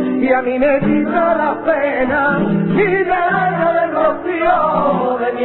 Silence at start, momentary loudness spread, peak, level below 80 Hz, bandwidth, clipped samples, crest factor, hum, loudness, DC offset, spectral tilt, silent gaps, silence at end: 0 s; 2 LU; -2 dBFS; -46 dBFS; 4.2 kHz; under 0.1%; 12 dB; none; -15 LUFS; under 0.1%; -12 dB/octave; none; 0 s